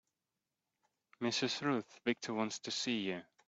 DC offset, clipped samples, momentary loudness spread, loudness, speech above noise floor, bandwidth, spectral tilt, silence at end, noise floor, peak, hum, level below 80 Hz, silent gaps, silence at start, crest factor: under 0.1%; under 0.1%; 4 LU; -37 LUFS; over 52 dB; 8.2 kHz; -3.5 dB/octave; 0.25 s; under -90 dBFS; -20 dBFS; none; -82 dBFS; none; 1.2 s; 20 dB